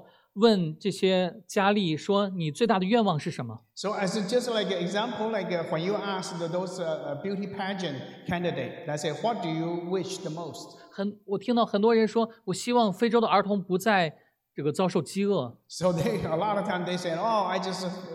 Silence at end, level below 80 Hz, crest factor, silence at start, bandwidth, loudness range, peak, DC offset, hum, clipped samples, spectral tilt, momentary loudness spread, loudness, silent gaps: 0 s; -68 dBFS; 18 dB; 0.35 s; 15 kHz; 6 LU; -8 dBFS; under 0.1%; none; under 0.1%; -5.5 dB/octave; 11 LU; -28 LUFS; none